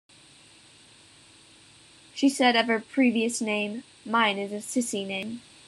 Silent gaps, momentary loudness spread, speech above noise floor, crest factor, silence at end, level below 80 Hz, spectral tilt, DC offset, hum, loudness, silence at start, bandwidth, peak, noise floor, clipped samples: none; 12 LU; 29 dB; 20 dB; 0.3 s; -76 dBFS; -3 dB/octave; under 0.1%; none; -25 LUFS; 2.15 s; 12.5 kHz; -8 dBFS; -54 dBFS; under 0.1%